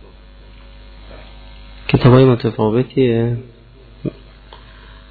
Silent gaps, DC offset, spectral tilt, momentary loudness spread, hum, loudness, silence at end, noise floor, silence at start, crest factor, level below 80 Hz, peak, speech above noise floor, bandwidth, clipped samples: none; under 0.1%; -11 dB/octave; 19 LU; none; -14 LUFS; 0.55 s; -42 dBFS; 1.05 s; 18 dB; -38 dBFS; 0 dBFS; 29 dB; 4.8 kHz; under 0.1%